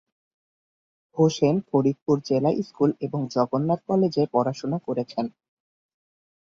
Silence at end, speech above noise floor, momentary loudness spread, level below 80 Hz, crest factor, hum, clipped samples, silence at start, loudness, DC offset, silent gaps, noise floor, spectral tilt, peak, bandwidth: 1.15 s; over 67 dB; 8 LU; -66 dBFS; 18 dB; none; under 0.1%; 1.15 s; -24 LUFS; under 0.1%; 2.02-2.06 s; under -90 dBFS; -7.5 dB/octave; -6 dBFS; 7.6 kHz